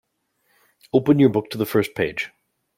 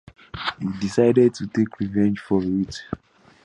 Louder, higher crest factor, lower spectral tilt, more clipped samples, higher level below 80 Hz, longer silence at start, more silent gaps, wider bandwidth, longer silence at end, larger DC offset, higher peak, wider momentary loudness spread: about the same, -20 LUFS vs -22 LUFS; about the same, 18 dB vs 18 dB; about the same, -7 dB/octave vs -7 dB/octave; neither; second, -58 dBFS vs -50 dBFS; first, 0.95 s vs 0.35 s; neither; first, 16.5 kHz vs 10.5 kHz; about the same, 0.5 s vs 0.5 s; neither; about the same, -4 dBFS vs -4 dBFS; second, 10 LU vs 16 LU